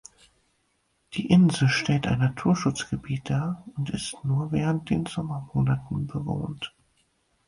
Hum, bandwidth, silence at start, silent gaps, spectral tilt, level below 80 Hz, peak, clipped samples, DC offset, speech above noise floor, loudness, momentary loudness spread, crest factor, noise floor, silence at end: none; 11 kHz; 1.1 s; none; -6 dB/octave; -52 dBFS; -8 dBFS; under 0.1%; under 0.1%; 46 dB; -26 LUFS; 12 LU; 18 dB; -71 dBFS; 0.8 s